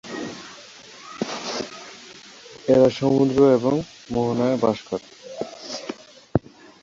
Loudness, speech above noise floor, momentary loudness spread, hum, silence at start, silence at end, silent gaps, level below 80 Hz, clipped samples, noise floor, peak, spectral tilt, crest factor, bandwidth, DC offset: -22 LUFS; 25 dB; 24 LU; none; 0.05 s; 0.45 s; none; -52 dBFS; under 0.1%; -44 dBFS; -2 dBFS; -6 dB/octave; 22 dB; 7.8 kHz; under 0.1%